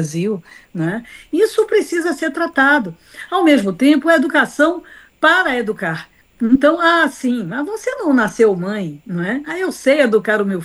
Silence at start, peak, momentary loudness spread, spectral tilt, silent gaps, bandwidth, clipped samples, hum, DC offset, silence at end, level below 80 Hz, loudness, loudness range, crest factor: 0 s; 0 dBFS; 11 LU; -5 dB/octave; none; 12.5 kHz; under 0.1%; none; under 0.1%; 0 s; -54 dBFS; -16 LUFS; 3 LU; 16 dB